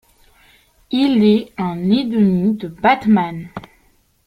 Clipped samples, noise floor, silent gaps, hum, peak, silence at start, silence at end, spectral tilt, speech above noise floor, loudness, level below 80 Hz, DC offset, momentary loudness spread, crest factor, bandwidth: under 0.1%; -57 dBFS; none; none; 0 dBFS; 0.9 s; 0.65 s; -8 dB/octave; 41 dB; -16 LUFS; -52 dBFS; under 0.1%; 12 LU; 16 dB; 5.4 kHz